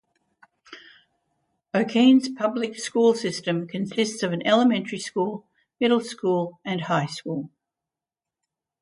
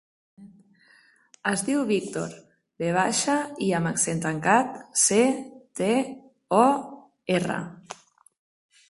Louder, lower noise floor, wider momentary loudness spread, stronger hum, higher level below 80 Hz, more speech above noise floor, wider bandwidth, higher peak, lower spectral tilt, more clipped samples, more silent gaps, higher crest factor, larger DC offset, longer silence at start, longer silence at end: about the same, -23 LUFS vs -24 LUFS; first, -89 dBFS vs -59 dBFS; second, 11 LU vs 19 LU; neither; second, -72 dBFS vs -64 dBFS; first, 66 dB vs 35 dB; about the same, 11.5 kHz vs 12 kHz; about the same, -6 dBFS vs -4 dBFS; about the same, -5 dB/octave vs -4 dB/octave; neither; neither; about the same, 18 dB vs 22 dB; neither; first, 0.7 s vs 0.4 s; first, 1.35 s vs 0.95 s